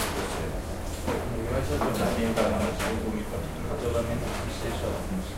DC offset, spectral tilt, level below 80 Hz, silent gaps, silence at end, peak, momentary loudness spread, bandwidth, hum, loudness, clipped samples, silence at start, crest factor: under 0.1%; -5.5 dB/octave; -36 dBFS; none; 0 s; -10 dBFS; 7 LU; 16 kHz; none; -30 LUFS; under 0.1%; 0 s; 18 dB